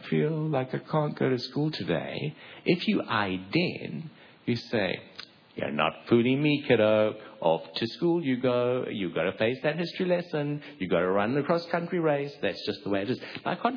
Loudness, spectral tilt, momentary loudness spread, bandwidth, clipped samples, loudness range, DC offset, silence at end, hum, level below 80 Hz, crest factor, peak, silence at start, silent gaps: -28 LUFS; -8 dB/octave; 10 LU; 5.4 kHz; under 0.1%; 4 LU; under 0.1%; 0 s; none; -68 dBFS; 20 dB; -8 dBFS; 0 s; none